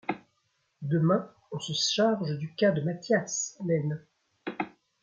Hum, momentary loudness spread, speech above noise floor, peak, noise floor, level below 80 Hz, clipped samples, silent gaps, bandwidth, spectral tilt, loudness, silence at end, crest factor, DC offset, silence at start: none; 15 LU; 47 dB; -12 dBFS; -74 dBFS; -74 dBFS; under 0.1%; none; 9 kHz; -4.5 dB/octave; -29 LUFS; 0.35 s; 18 dB; under 0.1%; 0.1 s